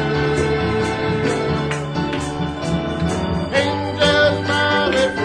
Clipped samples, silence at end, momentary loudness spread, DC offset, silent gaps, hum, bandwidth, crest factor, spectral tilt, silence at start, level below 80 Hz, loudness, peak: under 0.1%; 0 s; 7 LU; under 0.1%; none; none; 10.5 kHz; 16 dB; -5.5 dB/octave; 0 s; -36 dBFS; -19 LUFS; -2 dBFS